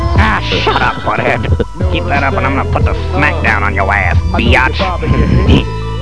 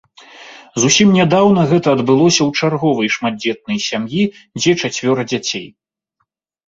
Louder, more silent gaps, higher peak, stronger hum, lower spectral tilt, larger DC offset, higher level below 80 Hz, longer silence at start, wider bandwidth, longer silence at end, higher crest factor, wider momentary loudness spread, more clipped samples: about the same, -12 LUFS vs -14 LUFS; neither; about the same, 0 dBFS vs 0 dBFS; neither; first, -6.5 dB/octave vs -4.5 dB/octave; first, 5% vs under 0.1%; first, -18 dBFS vs -54 dBFS; second, 0 s vs 0.35 s; first, 11 kHz vs 8 kHz; second, 0 s vs 1 s; about the same, 12 dB vs 16 dB; second, 5 LU vs 9 LU; first, 0.5% vs under 0.1%